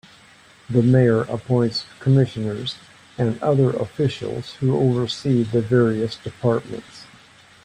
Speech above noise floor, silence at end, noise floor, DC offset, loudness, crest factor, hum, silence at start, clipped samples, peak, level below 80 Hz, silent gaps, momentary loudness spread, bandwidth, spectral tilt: 30 dB; 0.6 s; -50 dBFS; under 0.1%; -21 LUFS; 18 dB; none; 0.7 s; under 0.1%; -4 dBFS; -54 dBFS; none; 12 LU; 9.6 kHz; -7.5 dB/octave